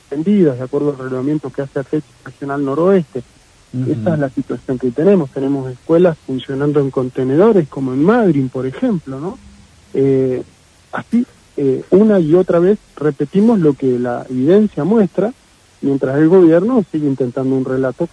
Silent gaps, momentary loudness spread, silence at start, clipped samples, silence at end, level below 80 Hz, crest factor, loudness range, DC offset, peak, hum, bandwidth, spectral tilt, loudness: none; 12 LU; 0.1 s; under 0.1%; 0.05 s; -52 dBFS; 14 dB; 5 LU; under 0.1%; 0 dBFS; none; 10.5 kHz; -9 dB/octave; -15 LUFS